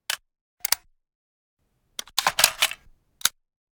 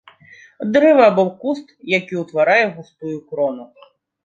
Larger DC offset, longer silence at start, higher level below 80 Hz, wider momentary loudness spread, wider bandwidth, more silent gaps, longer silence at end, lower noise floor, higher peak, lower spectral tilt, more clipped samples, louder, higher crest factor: neither; second, 0.1 s vs 0.6 s; first, -60 dBFS vs -66 dBFS; about the same, 17 LU vs 17 LU; first, over 20 kHz vs 7.6 kHz; first, 0.41-0.57 s, 1.15-1.57 s vs none; second, 0.45 s vs 0.6 s; first, -52 dBFS vs -46 dBFS; about the same, 0 dBFS vs -2 dBFS; second, 2 dB/octave vs -6.5 dB/octave; neither; second, -24 LUFS vs -17 LUFS; first, 30 dB vs 16 dB